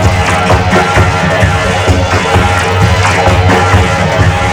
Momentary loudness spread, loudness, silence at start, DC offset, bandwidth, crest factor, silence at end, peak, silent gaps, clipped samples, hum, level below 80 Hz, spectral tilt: 2 LU; -9 LUFS; 0 s; under 0.1%; 14.5 kHz; 8 dB; 0 s; 0 dBFS; none; 0.5%; none; -20 dBFS; -5 dB/octave